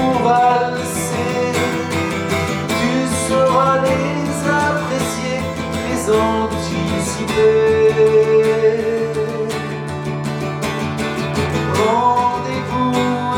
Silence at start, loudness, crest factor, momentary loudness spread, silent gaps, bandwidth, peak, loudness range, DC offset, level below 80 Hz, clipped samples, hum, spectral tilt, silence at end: 0 s; -17 LUFS; 14 dB; 9 LU; none; 19 kHz; -2 dBFS; 4 LU; under 0.1%; -46 dBFS; under 0.1%; none; -5 dB/octave; 0 s